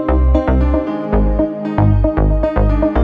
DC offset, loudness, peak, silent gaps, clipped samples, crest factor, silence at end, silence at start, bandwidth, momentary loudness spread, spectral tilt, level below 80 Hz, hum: under 0.1%; -15 LUFS; 0 dBFS; none; under 0.1%; 12 dB; 0 s; 0 s; 4.6 kHz; 4 LU; -10.5 dB/octave; -16 dBFS; none